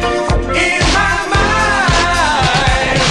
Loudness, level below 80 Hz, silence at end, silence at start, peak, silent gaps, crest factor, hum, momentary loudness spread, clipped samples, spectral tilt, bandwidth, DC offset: -12 LUFS; -22 dBFS; 0 s; 0 s; -2 dBFS; none; 12 dB; none; 2 LU; under 0.1%; -3.5 dB/octave; 12 kHz; under 0.1%